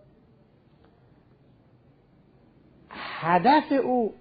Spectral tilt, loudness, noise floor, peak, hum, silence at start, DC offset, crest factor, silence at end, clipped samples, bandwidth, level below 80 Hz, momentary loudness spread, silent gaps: -10 dB/octave; -23 LUFS; -59 dBFS; -8 dBFS; none; 2.9 s; under 0.1%; 20 dB; 0.05 s; under 0.1%; 5 kHz; -66 dBFS; 19 LU; none